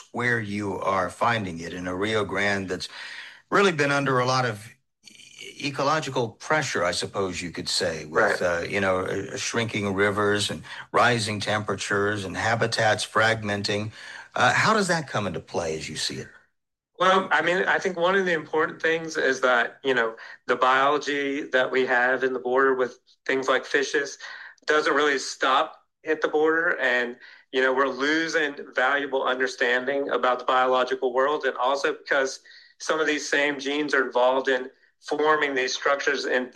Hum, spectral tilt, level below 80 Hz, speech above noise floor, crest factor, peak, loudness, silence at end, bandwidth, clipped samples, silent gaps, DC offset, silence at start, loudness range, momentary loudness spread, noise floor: none; -4 dB/octave; -66 dBFS; 52 dB; 18 dB; -8 dBFS; -24 LUFS; 0.05 s; 12.5 kHz; under 0.1%; none; under 0.1%; 0.15 s; 2 LU; 9 LU; -76 dBFS